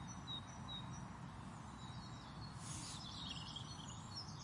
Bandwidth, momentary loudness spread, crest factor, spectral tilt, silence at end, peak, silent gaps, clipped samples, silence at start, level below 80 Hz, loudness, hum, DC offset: 11.5 kHz; 5 LU; 14 dB; -3.5 dB/octave; 0 s; -36 dBFS; none; under 0.1%; 0 s; -64 dBFS; -50 LUFS; none; under 0.1%